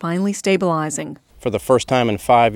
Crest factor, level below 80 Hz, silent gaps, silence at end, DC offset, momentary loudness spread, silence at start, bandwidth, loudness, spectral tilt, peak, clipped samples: 18 dB; -48 dBFS; none; 0 s; under 0.1%; 11 LU; 0 s; 17.5 kHz; -19 LUFS; -5 dB/octave; 0 dBFS; under 0.1%